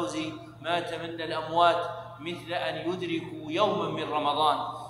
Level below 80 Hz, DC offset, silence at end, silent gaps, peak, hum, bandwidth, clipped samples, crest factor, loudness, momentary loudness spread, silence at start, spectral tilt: -66 dBFS; under 0.1%; 0 s; none; -8 dBFS; none; 12.5 kHz; under 0.1%; 20 dB; -29 LUFS; 13 LU; 0 s; -5 dB/octave